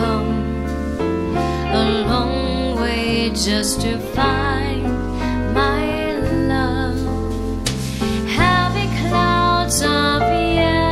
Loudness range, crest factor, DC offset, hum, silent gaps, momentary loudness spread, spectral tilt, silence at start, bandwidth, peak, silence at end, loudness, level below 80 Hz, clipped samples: 3 LU; 16 dB; under 0.1%; none; none; 6 LU; -5 dB/octave; 0 s; 16 kHz; -2 dBFS; 0 s; -19 LUFS; -28 dBFS; under 0.1%